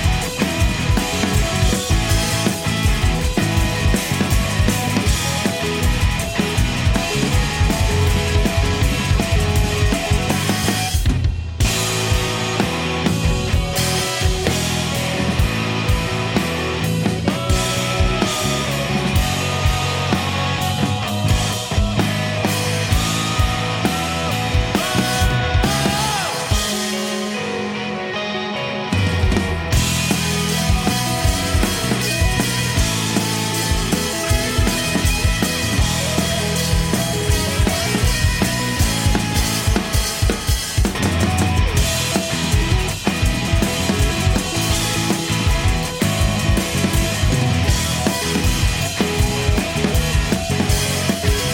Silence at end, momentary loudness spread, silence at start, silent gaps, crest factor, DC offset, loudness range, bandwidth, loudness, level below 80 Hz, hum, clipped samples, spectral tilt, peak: 0 s; 2 LU; 0 s; none; 14 dB; under 0.1%; 1 LU; 17 kHz; -18 LUFS; -24 dBFS; none; under 0.1%; -4 dB/octave; -4 dBFS